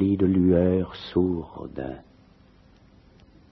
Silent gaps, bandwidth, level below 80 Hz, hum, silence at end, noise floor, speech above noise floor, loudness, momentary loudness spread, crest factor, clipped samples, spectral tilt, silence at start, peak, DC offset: none; 5.8 kHz; -50 dBFS; none; 1.5 s; -55 dBFS; 31 dB; -24 LUFS; 17 LU; 18 dB; under 0.1%; -10.5 dB/octave; 0 s; -8 dBFS; under 0.1%